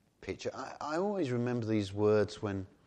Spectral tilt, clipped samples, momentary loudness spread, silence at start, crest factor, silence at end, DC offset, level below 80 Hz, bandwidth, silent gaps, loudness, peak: -7 dB/octave; under 0.1%; 11 LU; 0.2 s; 16 dB; 0.2 s; under 0.1%; -68 dBFS; 9.4 kHz; none; -34 LUFS; -18 dBFS